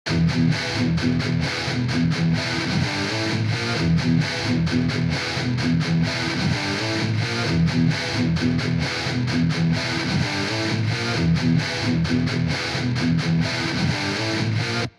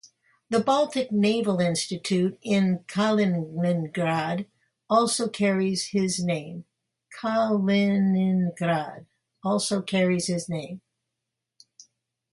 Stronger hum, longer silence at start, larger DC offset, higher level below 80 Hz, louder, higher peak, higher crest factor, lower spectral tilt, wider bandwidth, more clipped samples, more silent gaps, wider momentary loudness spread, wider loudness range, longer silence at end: neither; about the same, 0.05 s vs 0.05 s; neither; first, -42 dBFS vs -68 dBFS; first, -22 LUFS vs -25 LUFS; about the same, -10 dBFS vs -8 dBFS; second, 12 dB vs 18 dB; about the same, -5.5 dB/octave vs -5.5 dB/octave; about the same, 11.5 kHz vs 11.5 kHz; neither; neither; second, 3 LU vs 11 LU; about the same, 1 LU vs 3 LU; second, 0.1 s vs 1.55 s